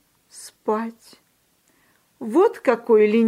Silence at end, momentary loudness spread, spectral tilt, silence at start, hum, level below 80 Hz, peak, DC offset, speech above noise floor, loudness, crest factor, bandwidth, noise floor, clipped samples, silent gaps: 0 s; 20 LU; -6 dB/octave; 0.35 s; none; -78 dBFS; -4 dBFS; under 0.1%; 45 dB; -20 LUFS; 18 dB; 12.5 kHz; -64 dBFS; under 0.1%; none